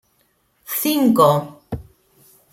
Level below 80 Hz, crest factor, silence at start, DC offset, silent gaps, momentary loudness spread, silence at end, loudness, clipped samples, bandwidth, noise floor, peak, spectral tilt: -50 dBFS; 18 dB; 0.7 s; under 0.1%; none; 19 LU; 0.7 s; -17 LUFS; under 0.1%; 16.5 kHz; -63 dBFS; -2 dBFS; -5.5 dB/octave